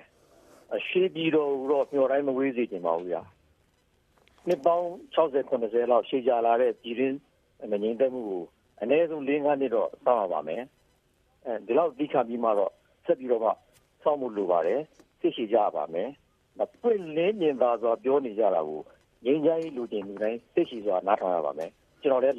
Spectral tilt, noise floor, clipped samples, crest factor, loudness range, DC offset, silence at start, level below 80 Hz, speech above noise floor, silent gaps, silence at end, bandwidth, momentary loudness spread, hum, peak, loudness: -7 dB/octave; -67 dBFS; under 0.1%; 18 dB; 3 LU; under 0.1%; 0.7 s; -72 dBFS; 41 dB; none; 0 s; 7.2 kHz; 11 LU; none; -8 dBFS; -27 LUFS